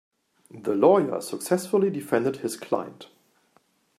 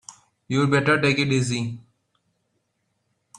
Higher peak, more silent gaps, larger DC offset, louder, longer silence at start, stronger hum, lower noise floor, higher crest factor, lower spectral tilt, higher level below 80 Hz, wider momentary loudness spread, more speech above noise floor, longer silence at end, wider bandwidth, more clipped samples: about the same, -6 dBFS vs -4 dBFS; neither; neither; second, -25 LUFS vs -21 LUFS; first, 0.55 s vs 0.1 s; neither; second, -65 dBFS vs -73 dBFS; about the same, 20 dB vs 20 dB; about the same, -5.5 dB/octave vs -5.5 dB/octave; second, -74 dBFS vs -60 dBFS; about the same, 12 LU vs 12 LU; second, 41 dB vs 52 dB; second, 0.95 s vs 1.6 s; first, 15 kHz vs 11 kHz; neither